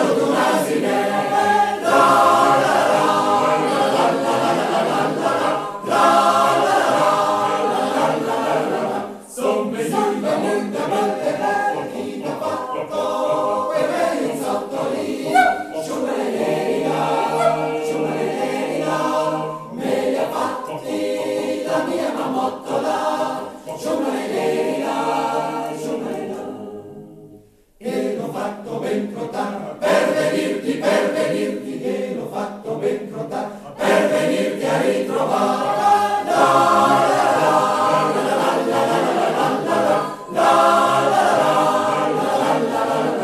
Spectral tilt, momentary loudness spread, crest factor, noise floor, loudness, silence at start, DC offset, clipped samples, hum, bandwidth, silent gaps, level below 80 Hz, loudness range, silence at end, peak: -4.5 dB/octave; 11 LU; 16 dB; -47 dBFS; -19 LUFS; 0 s; under 0.1%; under 0.1%; none; 14 kHz; none; -62 dBFS; 7 LU; 0 s; -2 dBFS